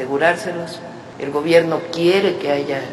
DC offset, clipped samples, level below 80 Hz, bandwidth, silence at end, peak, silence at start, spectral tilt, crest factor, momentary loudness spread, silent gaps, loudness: under 0.1%; under 0.1%; -62 dBFS; 13 kHz; 0 s; 0 dBFS; 0 s; -5.5 dB/octave; 18 dB; 15 LU; none; -18 LUFS